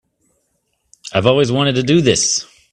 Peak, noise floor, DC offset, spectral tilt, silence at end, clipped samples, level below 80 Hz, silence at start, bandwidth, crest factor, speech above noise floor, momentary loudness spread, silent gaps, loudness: 0 dBFS; -67 dBFS; under 0.1%; -4 dB/octave; 0.3 s; under 0.1%; -50 dBFS; 1.05 s; 11 kHz; 18 dB; 53 dB; 8 LU; none; -15 LUFS